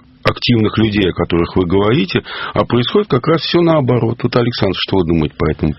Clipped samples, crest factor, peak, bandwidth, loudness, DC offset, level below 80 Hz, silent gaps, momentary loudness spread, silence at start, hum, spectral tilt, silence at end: under 0.1%; 14 dB; 0 dBFS; 6 kHz; -15 LUFS; under 0.1%; -34 dBFS; none; 5 LU; 0.25 s; none; -5 dB/octave; 0.05 s